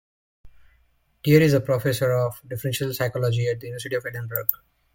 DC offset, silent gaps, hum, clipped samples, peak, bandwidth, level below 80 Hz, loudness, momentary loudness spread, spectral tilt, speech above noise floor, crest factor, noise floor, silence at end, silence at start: under 0.1%; none; none; under 0.1%; 0 dBFS; 17 kHz; -56 dBFS; -23 LUFS; 12 LU; -6 dB/octave; 41 dB; 24 dB; -64 dBFS; 0.4 s; 0.45 s